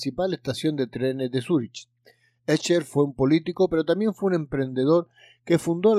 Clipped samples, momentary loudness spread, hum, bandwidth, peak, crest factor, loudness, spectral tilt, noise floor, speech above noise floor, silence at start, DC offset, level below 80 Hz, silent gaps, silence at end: under 0.1%; 6 LU; none; 13.5 kHz; -8 dBFS; 16 dB; -24 LUFS; -6.5 dB/octave; -60 dBFS; 37 dB; 0 s; under 0.1%; -58 dBFS; none; 0 s